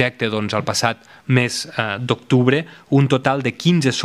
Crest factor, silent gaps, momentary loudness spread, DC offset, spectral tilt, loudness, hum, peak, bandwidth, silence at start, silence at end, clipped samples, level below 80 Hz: 18 dB; none; 7 LU; under 0.1%; -5.5 dB/octave; -19 LUFS; none; 0 dBFS; 14 kHz; 0 s; 0 s; under 0.1%; -60 dBFS